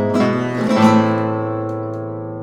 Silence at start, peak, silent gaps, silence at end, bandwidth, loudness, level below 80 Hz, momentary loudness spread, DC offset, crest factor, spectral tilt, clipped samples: 0 s; 0 dBFS; none; 0 s; 10.5 kHz; -17 LUFS; -56 dBFS; 13 LU; under 0.1%; 16 dB; -7 dB/octave; under 0.1%